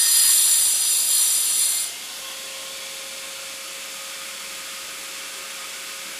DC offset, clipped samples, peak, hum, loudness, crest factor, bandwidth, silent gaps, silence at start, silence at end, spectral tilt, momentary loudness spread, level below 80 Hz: under 0.1%; under 0.1%; -2 dBFS; none; -16 LUFS; 20 dB; 16 kHz; none; 0 s; 0 s; 3.5 dB/octave; 17 LU; -72 dBFS